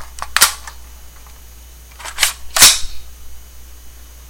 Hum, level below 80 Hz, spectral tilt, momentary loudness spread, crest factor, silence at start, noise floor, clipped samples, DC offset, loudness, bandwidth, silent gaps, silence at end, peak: none; -36 dBFS; 1.5 dB/octave; 25 LU; 18 dB; 0 s; -38 dBFS; 0.3%; under 0.1%; -11 LUFS; 17 kHz; none; 0.15 s; 0 dBFS